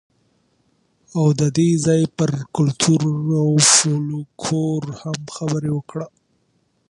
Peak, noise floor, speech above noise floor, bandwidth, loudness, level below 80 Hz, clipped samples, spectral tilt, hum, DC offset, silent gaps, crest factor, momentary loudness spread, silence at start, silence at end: 0 dBFS; -65 dBFS; 46 dB; 11.5 kHz; -18 LUFS; -56 dBFS; under 0.1%; -4.5 dB/octave; none; under 0.1%; none; 20 dB; 15 LU; 1.15 s; 0.85 s